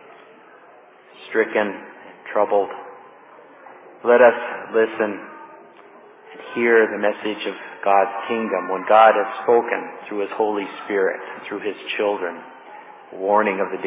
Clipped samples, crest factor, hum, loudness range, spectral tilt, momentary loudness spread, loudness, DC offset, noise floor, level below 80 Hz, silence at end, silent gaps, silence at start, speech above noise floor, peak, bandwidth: under 0.1%; 20 dB; none; 7 LU; -8 dB/octave; 23 LU; -20 LUFS; under 0.1%; -48 dBFS; -82 dBFS; 0 s; none; 1.2 s; 28 dB; 0 dBFS; 3.9 kHz